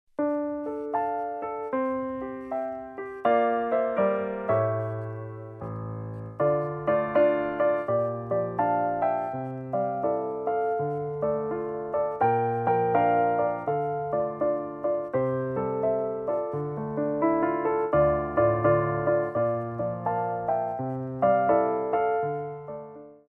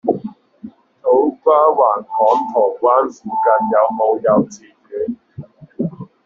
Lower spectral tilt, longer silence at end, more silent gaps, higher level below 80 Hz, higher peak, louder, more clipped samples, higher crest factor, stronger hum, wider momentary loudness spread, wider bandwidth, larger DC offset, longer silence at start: first, -10.5 dB/octave vs -7 dB/octave; about the same, 0.15 s vs 0.2 s; neither; about the same, -56 dBFS vs -60 dBFS; second, -10 dBFS vs -2 dBFS; second, -27 LUFS vs -16 LUFS; neither; about the same, 16 dB vs 16 dB; neither; about the same, 10 LU vs 12 LU; second, 3.8 kHz vs 7.4 kHz; neither; first, 0.2 s vs 0.05 s